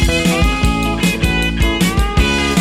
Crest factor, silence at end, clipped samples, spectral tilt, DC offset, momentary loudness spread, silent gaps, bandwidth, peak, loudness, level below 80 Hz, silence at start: 12 dB; 0 s; under 0.1%; -4.5 dB/octave; under 0.1%; 2 LU; none; 16 kHz; -2 dBFS; -15 LUFS; -18 dBFS; 0 s